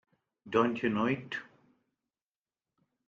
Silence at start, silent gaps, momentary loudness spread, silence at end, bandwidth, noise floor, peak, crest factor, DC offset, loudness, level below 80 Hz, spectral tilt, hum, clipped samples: 0.45 s; none; 11 LU; 1.65 s; 7.2 kHz; under -90 dBFS; -12 dBFS; 24 dB; under 0.1%; -32 LUFS; -72 dBFS; -7 dB/octave; none; under 0.1%